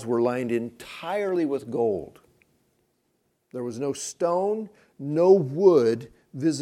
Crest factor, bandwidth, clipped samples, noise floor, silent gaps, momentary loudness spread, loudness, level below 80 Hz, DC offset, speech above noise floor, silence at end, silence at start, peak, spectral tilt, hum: 20 dB; 13 kHz; under 0.1%; -72 dBFS; none; 18 LU; -24 LUFS; -70 dBFS; under 0.1%; 48 dB; 0 s; 0 s; -4 dBFS; -6 dB/octave; none